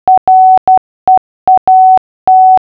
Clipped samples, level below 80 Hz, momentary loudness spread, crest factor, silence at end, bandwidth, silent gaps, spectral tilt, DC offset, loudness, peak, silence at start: under 0.1%; -46 dBFS; 5 LU; 6 dB; 0 s; 3.1 kHz; 0.18-0.27 s, 0.58-0.67 s, 0.78-1.07 s, 1.18-1.47 s, 1.58-1.67 s, 1.98-2.27 s; -7.5 dB/octave; under 0.1%; -7 LUFS; 0 dBFS; 0.05 s